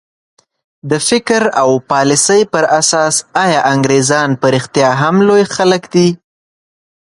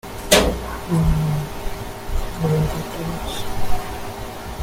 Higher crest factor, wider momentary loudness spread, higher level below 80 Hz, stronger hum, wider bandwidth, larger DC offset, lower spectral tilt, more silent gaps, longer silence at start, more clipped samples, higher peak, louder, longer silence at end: second, 12 dB vs 20 dB; second, 4 LU vs 15 LU; second, -54 dBFS vs -28 dBFS; neither; second, 11.5 kHz vs 17 kHz; neither; about the same, -4 dB/octave vs -4.5 dB/octave; neither; first, 0.85 s vs 0.05 s; neither; about the same, 0 dBFS vs 0 dBFS; first, -11 LUFS vs -23 LUFS; first, 0.85 s vs 0 s